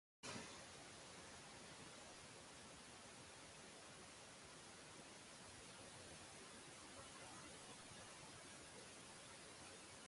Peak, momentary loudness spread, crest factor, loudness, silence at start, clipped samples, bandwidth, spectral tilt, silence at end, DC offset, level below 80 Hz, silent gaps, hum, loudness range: -40 dBFS; 2 LU; 20 dB; -58 LUFS; 0.25 s; under 0.1%; 11.5 kHz; -2 dB/octave; 0 s; under 0.1%; -78 dBFS; none; none; 1 LU